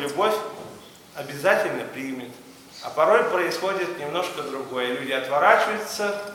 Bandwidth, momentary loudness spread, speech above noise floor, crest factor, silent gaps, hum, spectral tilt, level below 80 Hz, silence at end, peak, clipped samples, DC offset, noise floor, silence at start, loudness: 18.5 kHz; 19 LU; 21 dB; 22 dB; none; none; -3.5 dB/octave; -70 dBFS; 0 s; -2 dBFS; under 0.1%; under 0.1%; -44 dBFS; 0 s; -23 LUFS